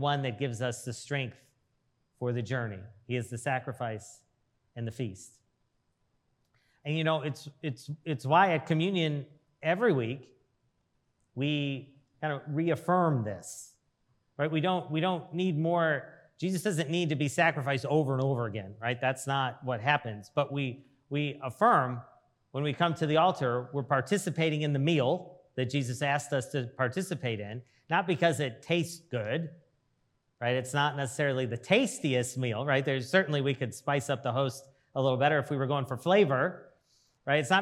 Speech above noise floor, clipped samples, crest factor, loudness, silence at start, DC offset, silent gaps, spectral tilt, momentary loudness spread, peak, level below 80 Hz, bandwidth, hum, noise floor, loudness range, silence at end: 46 dB; under 0.1%; 22 dB; -30 LUFS; 0 s; under 0.1%; none; -5.5 dB/octave; 12 LU; -10 dBFS; -78 dBFS; 14 kHz; none; -76 dBFS; 7 LU; 0 s